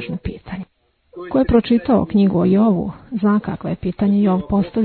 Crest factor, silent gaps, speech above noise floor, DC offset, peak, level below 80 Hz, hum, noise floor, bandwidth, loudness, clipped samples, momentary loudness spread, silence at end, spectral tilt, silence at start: 16 dB; none; 42 dB; under 0.1%; -2 dBFS; -38 dBFS; none; -58 dBFS; 4.5 kHz; -17 LUFS; under 0.1%; 14 LU; 0 s; -12 dB/octave; 0 s